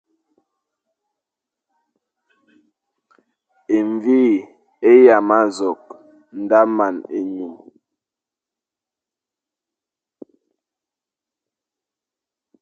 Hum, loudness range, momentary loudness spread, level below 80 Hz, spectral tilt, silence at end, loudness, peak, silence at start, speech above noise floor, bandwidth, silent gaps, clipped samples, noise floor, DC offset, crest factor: none; 13 LU; 20 LU; -72 dBFS; -6.5 dB/octave; 5.1 s; -16 LUFS; 0 dBFS; 3.7 s; 73 dB; 8.6 kHz; none; under 0.1%; -88 dBFS; under 0.1%; 20 dB